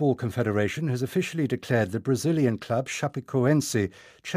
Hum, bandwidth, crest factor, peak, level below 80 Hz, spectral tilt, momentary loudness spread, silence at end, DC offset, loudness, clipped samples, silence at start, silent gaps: none; 15.5 kHz; 16 dB; -10 dBFS; -64 dBFS; -6 dB/octave; 6 LU; 0 s; under 0.1%; -26 LUFS; under 0.1%; 0 s; none